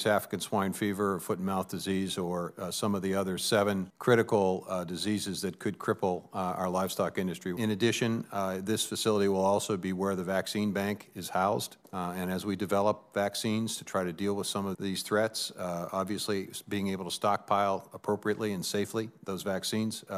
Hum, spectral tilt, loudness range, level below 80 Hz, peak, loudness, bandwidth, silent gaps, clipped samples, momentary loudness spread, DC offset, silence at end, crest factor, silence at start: none; -4.5 dB/octave; 3 LU; -74 dBFS; -12 dBFS; -31 LUFS; 15.5 kHz; none; under 0.1%; 7 LU; under 0.1%; 0 s; 20 dB; 0 s